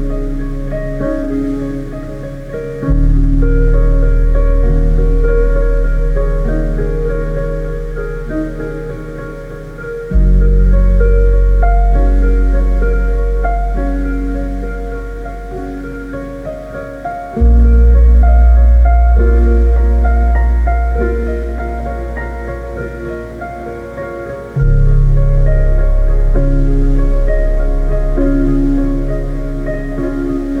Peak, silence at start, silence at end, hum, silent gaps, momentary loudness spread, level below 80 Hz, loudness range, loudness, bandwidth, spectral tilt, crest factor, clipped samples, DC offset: 0 dBFS; 0 s; 0 s; none; none; 14 LU; -12 dBFS; 10 LU; -15 LUFS; 2.6 kHz; -9.5 dB/octave; 10 dB; under 0.1%; under 0.1%